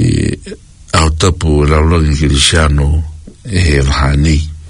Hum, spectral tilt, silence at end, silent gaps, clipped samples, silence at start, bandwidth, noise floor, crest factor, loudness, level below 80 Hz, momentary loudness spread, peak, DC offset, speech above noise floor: none; -5 dB/octave; 0 s; none; 0.1%; 0 s; 11 kHz; -31 dBFS; 12 dB; -11 LUFS; -18 dBFS; 10 LU; 0 dBFS; under 0.1%; 21 dB